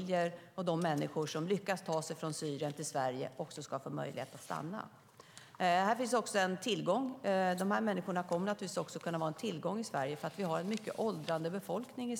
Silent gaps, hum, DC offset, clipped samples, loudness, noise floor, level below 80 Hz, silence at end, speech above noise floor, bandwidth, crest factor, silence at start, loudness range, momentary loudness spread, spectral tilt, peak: none; none; under 0.1%; under 0.1%; -37 LUFS; -58 dBFS; -86 dBFS; 0 s; 21 dB; 18 kHz; 18 dB; 0 s; 6 LU; 10 LU; -5 dB/octave; -18 dBFS